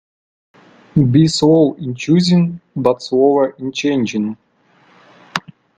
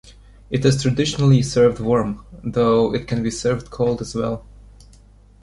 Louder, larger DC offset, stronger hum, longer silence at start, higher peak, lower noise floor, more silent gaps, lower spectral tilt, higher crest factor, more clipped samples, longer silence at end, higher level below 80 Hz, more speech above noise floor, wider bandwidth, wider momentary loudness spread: first, -15 LUFS vs -19 LUFS; neither; neither; first, 0.95 s vs 0.05 s; about the same, 0 dBFS vs -2 dBFS; first, -54 dBFS vs -48 dBFS; neither; about the same, -6.5 dB/octave vs -6.5 dB/octave; about the same, 16 dB vs 18 dB; neither; second, 0.4 s vs 1 s; second, -50 dBFS vs -42 dBFS; first, 40 dB vs 29 dB; second, 9.4 kHz vs 11.5 kHz; first, 14 LU vs 11 LU